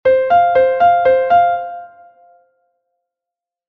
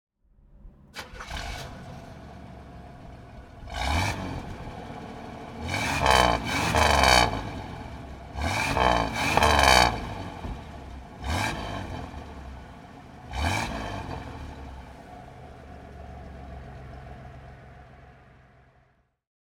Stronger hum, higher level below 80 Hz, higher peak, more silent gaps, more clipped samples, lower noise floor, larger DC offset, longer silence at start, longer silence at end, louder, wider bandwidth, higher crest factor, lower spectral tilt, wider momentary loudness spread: neither; second, -54 dBFS vs -38 dBFS; about the same, -2 dBFS vs -2 dBFS; neither; neither; first, -86 dBFS vs -65 dBFS; neither; second, 0.05 s vs 0.65 s; first, 1.8 s vs 1.4 s; first, -12 LUFS vs -25 LUFS; second, 4.6 kHz vs 19 kHz; second, 12 dB vs 28 dB; first, -6 dB/octave vs -3.5 dB/octave; second, 13 LU vs 25 LU